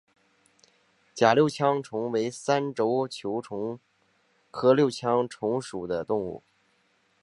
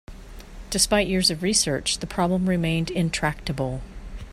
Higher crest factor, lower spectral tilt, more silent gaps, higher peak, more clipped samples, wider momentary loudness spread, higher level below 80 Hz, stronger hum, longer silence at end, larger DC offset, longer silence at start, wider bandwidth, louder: about the same, 22 dB vs 18 dB; first, -5.5 dB/octave vs -3.5 dB/octave; neither; about the same, -4 dBFS vs -6 dBFS; neither; about the same, 14 LU vs 13 LU; second, -68 dBFS vs -40 dBFS; neither; first, 0.85 s vs 0 s; neither; first, 1.15 s vs 0.1 s; second, 11.5 kHz vs 15 kHz; second, -26 LUFS vs -23 LUFS